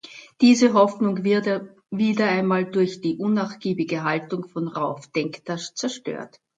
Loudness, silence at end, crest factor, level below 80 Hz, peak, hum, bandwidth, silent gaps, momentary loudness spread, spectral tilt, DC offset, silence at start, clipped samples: -22 LUFS; 0.3 s; 20 dB; -70 dBFS; -4 dBFS; none; 9.2 kHz; none; 13 LU; -5.5 dB/octave; under 0.1%; 0.05 s; under 0.1%